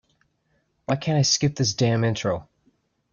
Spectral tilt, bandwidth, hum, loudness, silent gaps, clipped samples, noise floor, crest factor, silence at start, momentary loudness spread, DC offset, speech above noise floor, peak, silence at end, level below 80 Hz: -4.5 dB/octave; 7.4 kHz; none; -23 LUFS; none; under 0.1%; -69 dBFS; 18 dB; 0.9 s; 9 LU; under 0.1%; 47 dB; -8 dBFS; 0.7 s; -56 dBFS